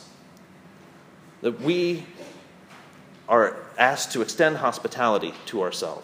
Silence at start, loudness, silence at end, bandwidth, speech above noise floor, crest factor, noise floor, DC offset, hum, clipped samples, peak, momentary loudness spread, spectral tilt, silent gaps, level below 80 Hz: 0 s; -24 LUFS; 0 s; 15.5 kHz; 26 dB; 26 dB; -50 dBFS; under 0.1%; none; under 0.1%; -2 dBFS; 13 LU; -4 dB/octave; none; -76 dBFS